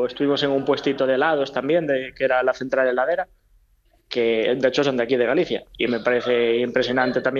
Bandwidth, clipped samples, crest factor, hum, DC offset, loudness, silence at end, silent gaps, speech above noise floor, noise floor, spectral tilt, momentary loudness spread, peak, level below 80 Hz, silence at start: 7.2 kHz; under 0.1%; 16 dB; none; under 0.1%; -21 LUFS; 0 s; none; 39 dB; -60 dBFS; -5.5 dB/octave; 4 LU; -6 dBFS; -56 dBFS; 0 s